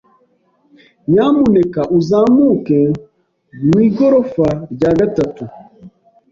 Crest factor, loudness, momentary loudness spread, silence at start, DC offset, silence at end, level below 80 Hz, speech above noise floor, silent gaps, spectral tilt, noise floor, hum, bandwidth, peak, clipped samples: 12 dB; -13 LUFS; 10 LU; 1.1 s; under 0.1%; 0.45 s; -46 dBFS; 45 dB; none; -9 dB/octave; -57 dBFS; none; 7.4 kHz; -2 dBFS; under 0.1%